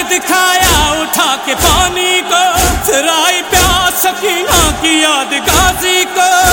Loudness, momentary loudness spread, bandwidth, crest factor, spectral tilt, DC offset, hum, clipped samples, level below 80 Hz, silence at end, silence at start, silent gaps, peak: -9 LUFS; 3 LU; 17.5 kHz; 10 dB; -2 dB/octave; under 0.1%; none; 0.1%; -24 dBFS; 0 s; 0 s; none; 0 dBFS